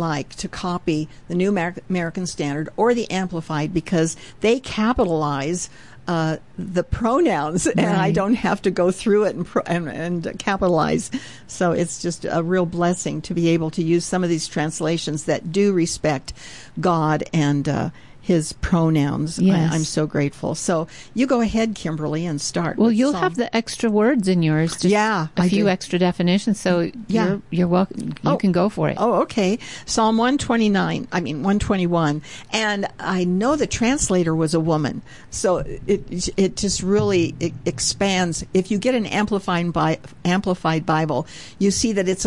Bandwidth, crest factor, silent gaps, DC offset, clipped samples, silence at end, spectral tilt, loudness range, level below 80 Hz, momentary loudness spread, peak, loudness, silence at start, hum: 11.5 kHz; 14 dB; none; 0.5%; under 0.1%; 0 s; -5.5 dB/octave; 3 LU; -44 dBFS; 7 LU; -8 dBFS; -21 LUFS; 0 s; none